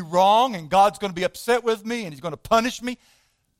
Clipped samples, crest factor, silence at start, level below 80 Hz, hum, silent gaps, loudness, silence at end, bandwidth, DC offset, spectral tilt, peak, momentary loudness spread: under 0.1%; 16 dB; 0 s; -54 dBFS; none; none; -22 LUFS; 0.65 s; 16.5 kHz; under 0.1%; -4 dB/octave; -6 dBFS; 14 LU